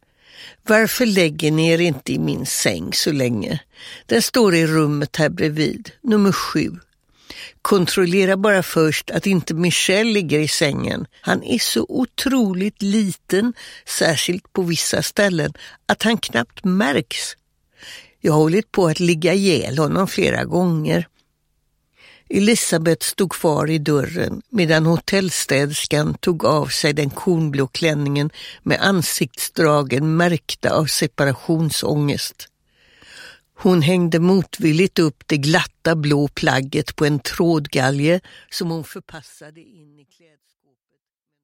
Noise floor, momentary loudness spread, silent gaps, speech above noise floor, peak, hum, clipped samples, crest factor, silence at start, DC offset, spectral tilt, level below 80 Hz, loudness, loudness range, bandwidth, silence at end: -78 dBFS; 9 LU; none; 60 dB; 0 dBFS; none; under 0.1%; 18 dB; 0.4 s; under 0.1%; -4.5 dB/octave; -52 dBFS; -18 LUFS; 3 LU; 16.5 kHz; 1.95 s